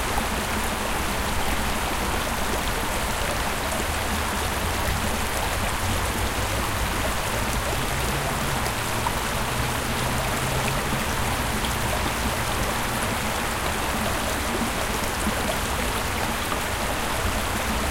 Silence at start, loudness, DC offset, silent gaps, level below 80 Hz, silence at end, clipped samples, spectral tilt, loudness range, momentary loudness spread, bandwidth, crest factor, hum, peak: 0 s; -25 LUFS; under 0.1%; none; -32 dBFS; 0 s; under 0.1%; -3.5 dB/octave; 1 LU; 1 LU; 17 kHz; 16 dB; none; -10 dBFS